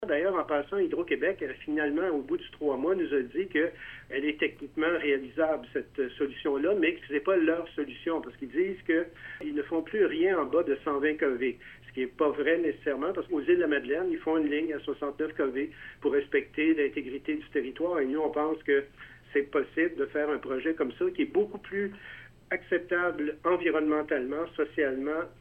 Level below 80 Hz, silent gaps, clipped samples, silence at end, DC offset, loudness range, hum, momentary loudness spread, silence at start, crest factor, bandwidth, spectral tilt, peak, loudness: -60 dBFS; none; under 0.1%; 0.1 s; under 0.1%; 2 LU; none; 8 LU; 0 s; 16 dB; 4.3 kHz; -7.5 dB/octave; -14 dBFS; -30 LUFS